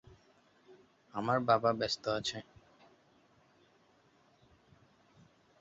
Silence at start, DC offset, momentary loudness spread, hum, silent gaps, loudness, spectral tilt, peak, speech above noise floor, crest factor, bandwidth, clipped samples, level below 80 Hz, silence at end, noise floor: 0.7 s; under 0.1%; 13 LU; none; none; -33 LUFS; -3.5 dB/octave; -16 dBFS; 36 dB; 24 dB; 7.6 kHz; under 0.1%; -70 dBFS; 3.2 s; -68 dBFS